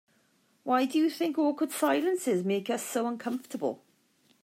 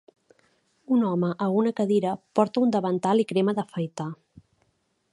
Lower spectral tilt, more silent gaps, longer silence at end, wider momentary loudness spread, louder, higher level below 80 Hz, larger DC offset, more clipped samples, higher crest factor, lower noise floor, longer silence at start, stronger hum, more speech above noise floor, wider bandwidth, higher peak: second, -4.5 dB/octave vs -7.5 dB/octave; neither; second, 0.65 s vs 1 s; about the same, 8 LU vs 9 LU; second, -29 LUFS vs -25 LUFS; second, -88 dBFS vs -72 dBFS; neither; neither; about the same, 16 dB vs 20 dB; about the same, -68 dBFS vs -70 dBFS; second, 0.65 s vs 0.9 s; neither; second, 40 dB vs 46 dB; first, 16 kHz vs 11.5 kHz; second, -14 dBFS vs -6 dBFS